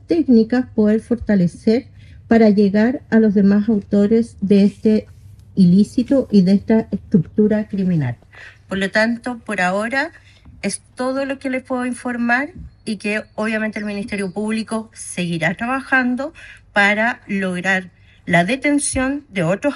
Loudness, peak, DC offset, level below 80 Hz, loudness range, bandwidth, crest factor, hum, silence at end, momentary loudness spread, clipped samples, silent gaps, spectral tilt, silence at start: -18 LUFS; -2 dBFS; under 0.1%; -48 dBFS; 7 LU; 11.5 kHz; 16 dB; none; 0 s; 11 LU; under 0.1%; none; -6 dB/octave; 0.1 s